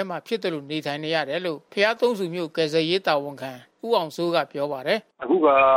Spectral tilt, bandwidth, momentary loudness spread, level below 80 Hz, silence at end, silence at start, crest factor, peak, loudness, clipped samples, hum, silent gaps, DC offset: -5 dB/octave; 16 kHz; 8 LU; -66 dBFS; 0 s; 0 s; 18 dB; -6 dBFS; -24 LUFS; under 0.1%; none; none; under 0.1%